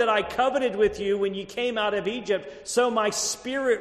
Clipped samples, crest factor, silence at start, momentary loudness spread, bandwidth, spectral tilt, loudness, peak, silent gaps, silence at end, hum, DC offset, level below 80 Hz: under 0.1%; 16 dB; 0 s; 5 LU; 13.5 kHz; -2.5 dB/octave; -25 LUFS; -10 dBFS; none; 0 s; none; under 0.1%; -54 dBFS